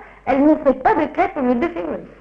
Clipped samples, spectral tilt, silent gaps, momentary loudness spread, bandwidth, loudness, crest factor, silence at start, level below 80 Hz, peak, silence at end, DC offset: under 0.1%; -8 dB/octave; none; 9 LU; 6.2 kHz; -18 LUFS; 14 dB; 0 s; -44 dBFS; -4 dBFS; 0.15 s; under 0.1%